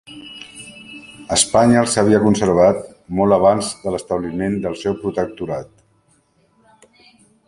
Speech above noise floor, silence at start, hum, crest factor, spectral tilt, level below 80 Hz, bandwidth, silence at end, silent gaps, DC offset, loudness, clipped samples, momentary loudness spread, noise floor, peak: 42 dB; 0.1 s; none; 18 dB; -4.5 dB/octave; -46 dBFS; 11.5 kHz; 1.8 s; none; under 0.1%; -17 LUFS; under 0.1%; 22 LU; -59 dBFS; 0 dBFS